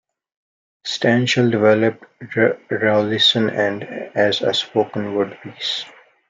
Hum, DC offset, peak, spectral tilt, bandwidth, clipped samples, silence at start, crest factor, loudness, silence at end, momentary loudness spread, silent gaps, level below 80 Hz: none; under 0.1%; -2 dBFS; -5 dB/octave; 9 kHz; under 0.1%; 0.85 s; 18 dB; -18 LUFS; 0.4 s; 12 LU; none; -66 dBFS